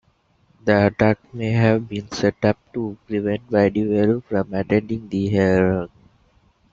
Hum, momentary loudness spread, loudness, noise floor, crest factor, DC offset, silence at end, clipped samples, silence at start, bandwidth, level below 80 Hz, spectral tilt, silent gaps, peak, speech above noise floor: none; 9 LU; -20 LUFS; -61 dBFS; 18 dB; under 0.1%; 0.85 s; under 0.1%; 0.65 s; 7.6 kHz; -50 dBFS; -7.5 dB/octave; none; -2 dBFS; 41 dB